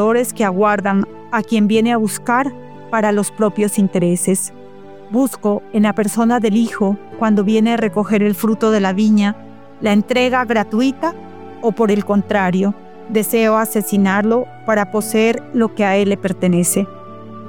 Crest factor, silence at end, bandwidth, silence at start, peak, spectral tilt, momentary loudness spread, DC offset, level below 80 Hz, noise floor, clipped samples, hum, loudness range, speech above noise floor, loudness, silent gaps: 14 dB; 0 s; 18.5 kHz; 0 s; -2 dBFS; -5.5 dB/octave; 7 LU; 0.9%; -62 dBFS; -38 dBFS; under 0.1%; none; 2 LU; 22 dB; -16 LUFS; none